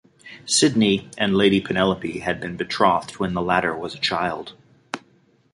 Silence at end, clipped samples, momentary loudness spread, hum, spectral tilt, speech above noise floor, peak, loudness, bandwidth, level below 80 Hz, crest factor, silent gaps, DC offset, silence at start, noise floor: 0.55 s; under 0.1%; 17 LU; none; -4 dB/octave; 38 dB; -2 dBFS; -21 LUFS; 11.5 kHz; -52 dBFS; 20 dB; none; under 0.1%; 0.25 s; -59 dBFS